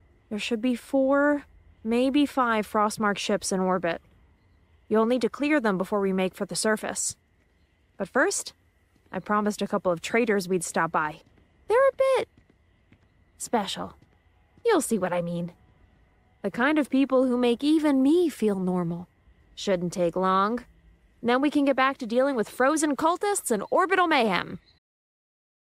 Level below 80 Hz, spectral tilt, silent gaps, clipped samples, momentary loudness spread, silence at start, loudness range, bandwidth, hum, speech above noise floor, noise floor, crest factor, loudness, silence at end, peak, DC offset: -62 dBFS; -4.5 dB/octave; none; under 0.1%; 11 LU; 0.3 s; 5 LU; 16 kHz; none; 40 dB; -64 dBFS; 16 dB; -25 LUFS; 1.2 s; -10 dBFS; under 0.1%